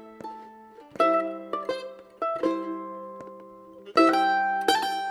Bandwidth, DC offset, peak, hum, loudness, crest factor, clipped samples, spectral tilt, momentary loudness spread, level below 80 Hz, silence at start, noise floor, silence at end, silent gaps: 14 kHz; under 0.1%; -6 dBFS; none; -25 LUFS; 20 dB; under 0.1%; -3.5 dB/octave; 22 LU; -70 dBFS; 0 s; -48 dBFS; 0 s; none